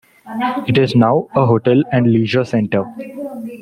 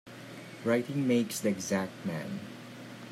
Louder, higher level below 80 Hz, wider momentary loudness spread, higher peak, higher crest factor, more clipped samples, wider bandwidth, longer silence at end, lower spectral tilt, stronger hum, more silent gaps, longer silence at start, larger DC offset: first, -15 LUFS vs -32 LUFS; first, -54 dBFS vs -76 dBFS; about the same, 15 LU vs 17 LU; first, -2 dBFS vs -16 dBFS; about the same, 14 dB vs 18 dB; neither; second, 11 kHz vs 16 kHz; about the same, 0 s vs 0 s; first, -8 dB/octave vs -5 dB/octave; neither; neither; first, 0.25 s vs 0.05 s; neither